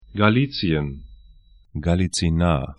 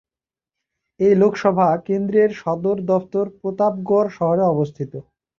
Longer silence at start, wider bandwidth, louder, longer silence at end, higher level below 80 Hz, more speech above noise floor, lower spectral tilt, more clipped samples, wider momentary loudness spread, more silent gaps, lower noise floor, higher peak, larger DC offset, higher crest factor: second, 0.1 s vs 1 s; first, 11 kHz vs 7 kHz; about the same, -21 LUFS vs -19 LUFS; second, 0.05 s vs 0.4 s; first, -36 dBFS vs -60 dBFS; second, 30 dB vs over 72 dB; second, -6 dB/octave vs -8.5 dB/octave; neither; first, 14 LU vs 9 LU; neither; second, -50 dBFS vs under -90 dBFS; first, 0 dBFS vs -4 dBFS; neither; first, 22 dB vs 16 dB